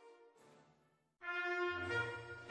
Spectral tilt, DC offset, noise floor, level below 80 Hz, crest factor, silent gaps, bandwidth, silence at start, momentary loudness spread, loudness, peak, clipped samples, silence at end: -5 dB/octave; under 0.1%; -76 dBFS; -76 dBFS; 16 dB; none; 10.5 kHz; 0 s; 10 LU; -41 LUFS; -28 dBFS; under 0.1%; 0 s